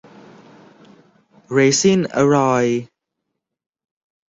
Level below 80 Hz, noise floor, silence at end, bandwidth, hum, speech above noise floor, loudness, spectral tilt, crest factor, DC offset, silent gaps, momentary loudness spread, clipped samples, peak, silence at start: -60 dBFS; -78 dBFS; 1.45 s; 8.2 kHz; none; 63 dB; -16 LUFS; -4.5 dB/octave; 18 dB; under 0.1%; none; 8 LU; under 0.1%; -4 dBFS; 1.5 s